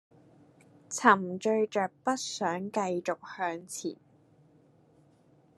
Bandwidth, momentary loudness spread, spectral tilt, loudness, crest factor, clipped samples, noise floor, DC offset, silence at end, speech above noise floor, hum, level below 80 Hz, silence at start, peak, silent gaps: 13 kHz; 14 LU; -4 dB/octave; -30 LUFS; 26 dB; under 0.1%; -63 dBFS; under 0.1%; 1.65 s; 33 dB; none; -82 dBFS; 0.9 s; -6 dBFS; none